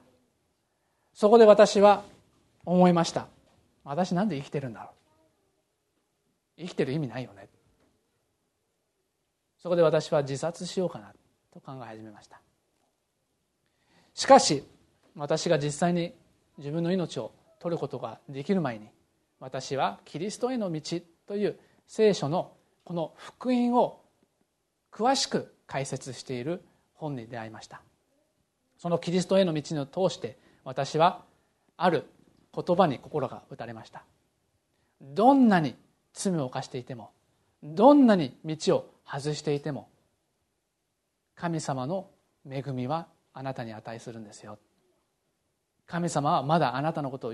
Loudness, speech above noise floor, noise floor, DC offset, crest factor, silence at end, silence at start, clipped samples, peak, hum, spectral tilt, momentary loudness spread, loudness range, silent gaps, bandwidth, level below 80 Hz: -26 LUFS; 53 dB; -79 dBFS; under 0.1%; 24 dB; 0 s; 1.2 s; under 0.1%; -4 dBFS; none; -5.5 dB/octave; 21 LU; 12 LU; none; 12 kHz; -70 dBFS